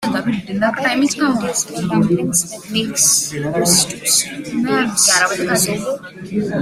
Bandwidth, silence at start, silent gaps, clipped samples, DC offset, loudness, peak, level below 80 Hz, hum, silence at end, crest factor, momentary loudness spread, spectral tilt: 16 kHz; 0 s; none; under 0.1%; under 0.1%; -16 LUFS; 0 dBFS; -52 dBFS; none; 0 s; 18 dB; 9 LU; -2.5 dB/octave